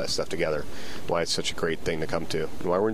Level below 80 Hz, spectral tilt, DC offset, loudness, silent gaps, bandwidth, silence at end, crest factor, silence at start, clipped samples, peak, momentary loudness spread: -48 dBFS; -4 dB/octave; 3%; -29 LUFS; none; 16 kHz; 0 s; 18 dB; 0 s; under 0.1%; -10 dBFS; 6 LU